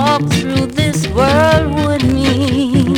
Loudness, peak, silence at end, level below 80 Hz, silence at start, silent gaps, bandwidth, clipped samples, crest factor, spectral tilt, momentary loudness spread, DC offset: -13 LUFS; 0 dBFS; 0 s; -30 dBFS; 0 s; none; 18.5 kHz; under 0.1%; 12 dB; -6 dB/octave; 4 LU; under 0.1%